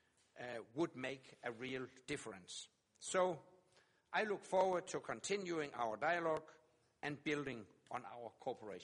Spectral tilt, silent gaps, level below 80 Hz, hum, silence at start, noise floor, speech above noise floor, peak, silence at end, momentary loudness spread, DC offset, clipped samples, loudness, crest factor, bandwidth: -4 dB/octave; none; -80 dBFS; none; 0.35 s; -74 dBFS; 32 dB; -24 dBFS; 0 s; 13 LU; under 0.1%; under 0.1%; -43 LUFS; 20 dB; 11.5 kHz